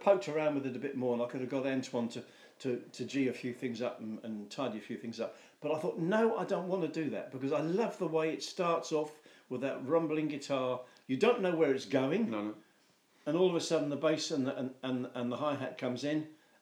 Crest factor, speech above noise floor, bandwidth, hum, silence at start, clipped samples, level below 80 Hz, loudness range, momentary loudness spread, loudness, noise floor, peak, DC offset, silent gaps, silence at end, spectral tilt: 20 dB; 35 dB; 20 kHz; none; 0 s; under 0.1%; under -90 dBFS; 5 LU; 11 LU; -35 LUFS; -69 dBFS; -14 dBFS; under 0.1%; none; 0.25 s; -5.5 dB/octave